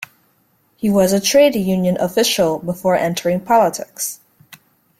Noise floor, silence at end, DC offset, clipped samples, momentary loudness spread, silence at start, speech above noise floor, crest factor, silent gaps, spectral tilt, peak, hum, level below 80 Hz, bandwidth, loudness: -60 dBFS; 0.45 s; under 0.1%; under 0.1%; 11 LU; 0.8 s; 44 dB; 16 dB; none; -4.5 dB/octave; -2 dBFS; none; -54 dBFS; 16.5 kHz; -16 LUFS